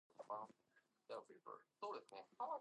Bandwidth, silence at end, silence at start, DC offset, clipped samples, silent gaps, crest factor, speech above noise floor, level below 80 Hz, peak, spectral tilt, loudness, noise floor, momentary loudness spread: 10 kHz; 0 s; 0.2 s; under 0.1%; under 0.1%; none; 20 dB; 29 dB; under -90 dBFS; -34 dBFS; -4 dB/octave; -54 LUFS; -81 dBFS; 9 LU